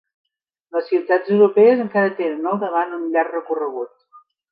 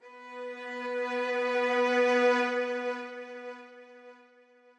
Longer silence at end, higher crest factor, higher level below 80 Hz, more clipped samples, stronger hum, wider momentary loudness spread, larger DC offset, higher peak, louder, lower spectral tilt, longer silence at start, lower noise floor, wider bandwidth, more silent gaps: second, 0.35 s vs 0.65 s; about the same, 16 dB vs 16 dB; first, -74 dBFS vs under -90 dBFS; neither; neither; second, 13 LU vs 19 LU; neither; first, -2 dBFS vs -14 dBFS; first, -19 LUFS vs -29 LUFS; first, -10 dB/octave vs -2.5 dB/octave; first, 0.75 s vs 0.05 s; second, -52 dBFS vs -60 dBFS; second, 5 kHz vs 10 kHz; neither